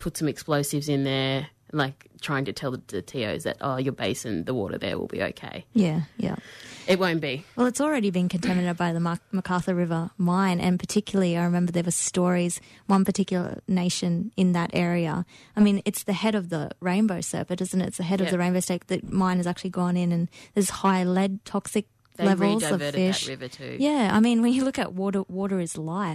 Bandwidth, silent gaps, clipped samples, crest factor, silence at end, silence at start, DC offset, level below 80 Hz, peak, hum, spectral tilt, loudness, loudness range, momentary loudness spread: 13.5 kHz; none; under 0.1%; 14 dB; 0 s; 0 s; under 0.1%; -58 dBFS; -10 dBFS; none; -5.5 dB/octave; -26 LUFS; 4 LU; 8 LU